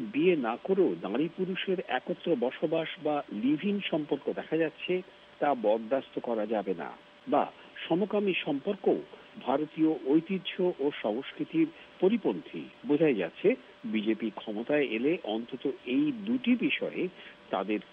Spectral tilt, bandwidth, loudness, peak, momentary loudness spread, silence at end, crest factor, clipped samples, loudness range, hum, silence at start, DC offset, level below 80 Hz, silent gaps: -8.5 dB/octave; 5.4 kHz; -30 LUFS; -14 dBFS; 8 LU; 0.1 s; 18 dB; under 0.1%; 2 LU; none; 0 s; under 0.1%; -76 dBFS; none